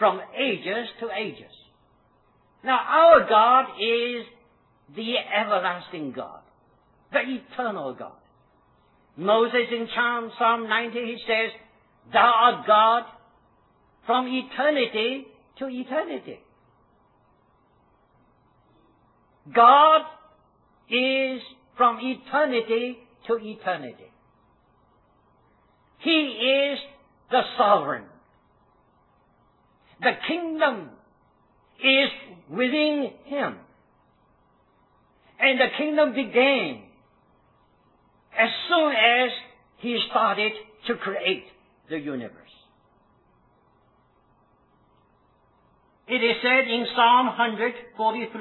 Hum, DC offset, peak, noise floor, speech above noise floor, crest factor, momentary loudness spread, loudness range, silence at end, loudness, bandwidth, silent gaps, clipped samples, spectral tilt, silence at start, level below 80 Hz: none; under 0.1%; -2 dBFS; -62 dBFS; 40 dB; 22 dB; 17 LU; 11 LU; 0 s; -22 LUFS; 4.3 kHz; none; under 0.1%; -6.5 dB/octave; 0 s; -68 dBFS